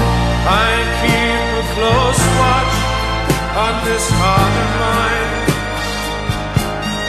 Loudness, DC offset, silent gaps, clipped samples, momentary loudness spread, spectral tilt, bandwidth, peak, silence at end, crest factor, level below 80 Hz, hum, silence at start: -15 LUFS; under 0.1%; none; under 0.1%; 6 LU; -4.5 dB/octave; 14.5 kHz; 0 dBFS; 0 s; 14 dB; -24 dBFS; none; 0 s